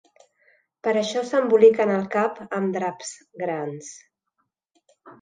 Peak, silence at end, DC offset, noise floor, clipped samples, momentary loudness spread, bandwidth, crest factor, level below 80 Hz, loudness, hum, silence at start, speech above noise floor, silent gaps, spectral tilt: -4 dBFS; 0.1 s; under 0.1%; -76 dBFS; under 0.1%; 20 LU; 9.4 kHz; 20 dB; -76 dBFS; -22 LUFS; none; 0.85 s; 54 dB; none; -5 dB/octave